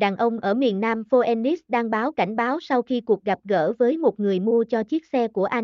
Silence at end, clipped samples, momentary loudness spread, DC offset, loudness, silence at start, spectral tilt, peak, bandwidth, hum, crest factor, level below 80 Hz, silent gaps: 0 s; under 0.1%; 4 LU; under 0.1%; -22 LUFS; 0 s; -7.5 dB/octave; -8 dBFS; 6.6 kHz; none; 14 dB; -68 dBFS; none